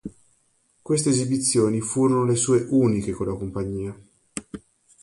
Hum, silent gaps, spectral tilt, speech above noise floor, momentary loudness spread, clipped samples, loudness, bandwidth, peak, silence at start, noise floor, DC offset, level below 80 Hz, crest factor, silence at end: none; none; -5.5 dB/octave; 44 dB; 17 LU; under 0.1%; -22 LUFS; 11.5 kHz; -8 dBFS; 0.05 s; -65 dBFS; under 0.1%; -50 dBFS; 16 dB; 0.45 s